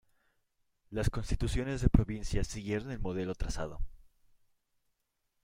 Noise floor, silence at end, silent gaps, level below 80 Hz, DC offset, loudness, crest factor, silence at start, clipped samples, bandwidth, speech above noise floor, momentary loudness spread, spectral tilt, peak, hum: -81 dBFS; 1.4 s; none; -40 dBFS; under 0.1%; -35 LUFS; 24 dB; 0.9 s; under 0.1%; 15 kHz; 49 dB; 13 LU; -6.5 dB/octave; -10 dBFS; none